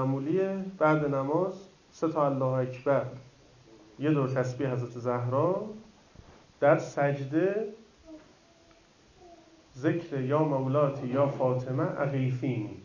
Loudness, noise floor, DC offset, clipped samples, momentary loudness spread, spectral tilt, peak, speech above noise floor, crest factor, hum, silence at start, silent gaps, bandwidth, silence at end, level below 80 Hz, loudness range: -29 LUFS; -60 dBFS; under 0.1%; under 0.1%; 8 LU; -8.5 dB/octave; -10 dBFS; 31 dB; 20 dB; none; 0 s; none; 7.4 kHz; 0 s; -66 dBFS; 4 LU